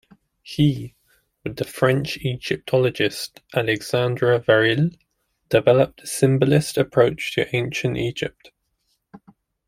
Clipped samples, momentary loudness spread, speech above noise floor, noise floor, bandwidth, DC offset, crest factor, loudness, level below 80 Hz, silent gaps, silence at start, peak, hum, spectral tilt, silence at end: under 0.1%; 13 LU; 51 dB; -71 dBFS; 16 kHz; under 0.1%; 18 dB; -21 LUFS; -54 dBFS; none; 0.45 s; -2 dBFS; none; -5.5 dB/octave; 0.5 s